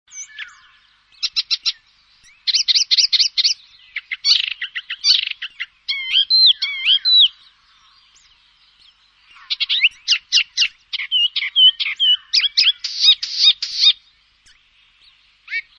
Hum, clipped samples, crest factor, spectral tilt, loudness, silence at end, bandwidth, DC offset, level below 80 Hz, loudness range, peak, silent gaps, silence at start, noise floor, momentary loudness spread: none; under 0.1%; 18 dB; 7 dB/octave; -14 LUFS; 0.2 s; 10 kHz; under 0.1%; -68 dBFS; 5 LU; -2 dBFS; none; 0.15 s; -55 dBFS; 15 LU